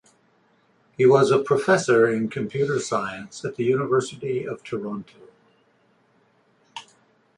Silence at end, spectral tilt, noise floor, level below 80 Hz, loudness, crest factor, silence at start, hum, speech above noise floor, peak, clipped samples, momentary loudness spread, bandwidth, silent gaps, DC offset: 0.55 s; -5.5 dB/octave; -62 dBFS; -66 dBFS; -22 LUFS; 20 dB; 1 s; none; 41 dB; -4 dBFS; under 0.1%; 17 LU; 11 kHz; none; under 0.1%